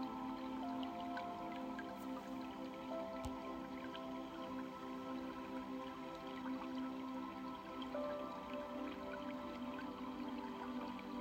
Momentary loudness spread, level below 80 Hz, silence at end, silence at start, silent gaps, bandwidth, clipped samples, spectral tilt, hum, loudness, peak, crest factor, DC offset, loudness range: 3 LU; -70 dBFS; 0 s; 0 s; none; 16 kHz; under 0.1%; -5.5 dB/octave; none; -47 LUFS; -32 dBFS; 16 dB; under 0.1%; 1 LU